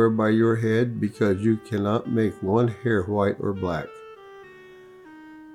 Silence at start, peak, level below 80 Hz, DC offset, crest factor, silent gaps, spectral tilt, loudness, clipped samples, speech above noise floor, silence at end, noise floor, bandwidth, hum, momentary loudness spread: 0 s; -8 dBFS; -62 dBFS; under 0.1%; 16 dB; none; -8.5 dB/octave; -23 LUFS; under 0.1%; 24 dB; 0 s; -47 dBFS; 11.5 kHz; none; 18 LU